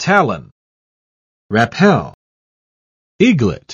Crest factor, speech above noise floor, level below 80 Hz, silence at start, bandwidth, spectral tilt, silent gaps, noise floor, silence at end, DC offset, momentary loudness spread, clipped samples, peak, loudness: 16 dB; over 77 dB; -48 dBFS; 0 s; 7.8 kHz; -6 dB/octave; 0.52-1.49 s, 2.14-3.19 s; under -90 dBFS; 0 s; under 0.1%; 10 LU; under 0.1%; 0 dBFS; -14 LUFS